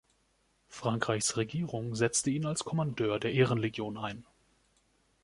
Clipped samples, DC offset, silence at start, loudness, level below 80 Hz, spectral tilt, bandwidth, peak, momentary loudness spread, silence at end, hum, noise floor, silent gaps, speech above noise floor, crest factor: under 0.1%; under 0.1%; 0.7 s; -32 LUFS; -64 dBFS; -4.5 dB/octave; 11.5 kHz; -12 dBFS; 10 LU; 1 s; none; -72 dBFS; none; 41 dB; 22 dB